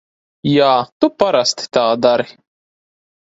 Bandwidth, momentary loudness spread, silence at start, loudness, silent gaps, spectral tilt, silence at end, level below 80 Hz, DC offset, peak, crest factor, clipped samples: 8 kHz; 6 LU; 0.45 s; -15 LUFS; 0.92-1.00 s; -4.5 dB/octave; 0.9 s; -58 dBFS; under 0.1%; 0 dBFS; 16 dB; under 0.1%